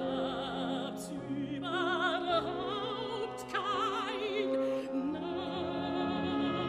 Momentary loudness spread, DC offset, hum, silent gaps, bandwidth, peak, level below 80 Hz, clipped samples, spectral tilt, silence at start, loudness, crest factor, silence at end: 6 LU; under 0.1%; none; none; 13.5 kHz; -18 dBFS; -64 dBFS; under 0.1%; -5 dB/octave; 0 s; -34 LUFS; 16 dB; 0 s